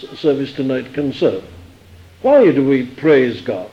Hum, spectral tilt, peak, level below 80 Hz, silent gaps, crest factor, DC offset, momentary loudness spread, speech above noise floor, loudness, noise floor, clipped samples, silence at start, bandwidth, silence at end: none; -7.5 dB/octave; -2 dBFS; -52 dBFS; none; 14 dB; under 0.1%; 10 LU; 27 dB; -16 LUFS; -42 dBFS; under 0.1%; 0 s; 8 kHz; 0.05 s